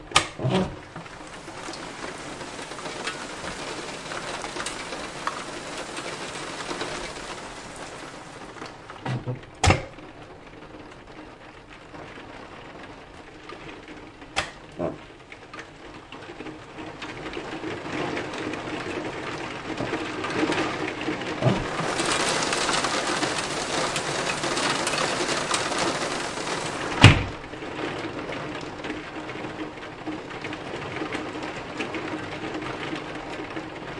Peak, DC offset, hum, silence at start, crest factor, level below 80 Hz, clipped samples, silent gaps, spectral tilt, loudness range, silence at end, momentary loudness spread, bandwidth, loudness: 0 dBFS; under 0.1%; none; 0 s; 28 dB; -48 dBFS; under 0.1%; none; -4 dB/octave; 13 LU; 0 s; 18 LU; 11.5 kHz; -28 LUFS